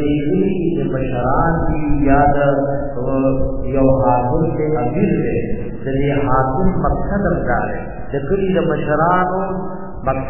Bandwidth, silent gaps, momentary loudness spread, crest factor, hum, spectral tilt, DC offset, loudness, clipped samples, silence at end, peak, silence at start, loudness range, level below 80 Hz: 3.2 kHz; none; 8 LU; 16 dB; none; -12 dB/octave; 4%; -18 LUFS; under 0.1%; 0 s; 0 dBFS; 0 s; 2 LU; -28 dBFS